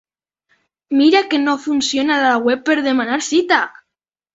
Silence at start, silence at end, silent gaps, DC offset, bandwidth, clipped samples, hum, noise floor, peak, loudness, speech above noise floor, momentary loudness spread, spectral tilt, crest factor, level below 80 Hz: 0.9 s; 0.65 s; none; under 0.1%; 8 kHz; under 0.1%; none; -81 dBFS; -2 dBFS; -16 LUFS; 65 dB; 5 LU; -2 dB/octave; 16 dB; -62 dBFS